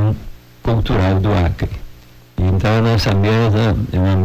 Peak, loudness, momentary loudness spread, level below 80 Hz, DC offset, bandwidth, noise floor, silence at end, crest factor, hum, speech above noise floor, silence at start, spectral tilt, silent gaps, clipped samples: -10 dBFS; -16 LUFS; 11 LU; -26 dBFS; under 0.1%; 15.5 kHz; -41 dBFS; 0 s; 6 dB; none; 27 dB; 0 s; -7.5 dB/octave; none; under 0.1%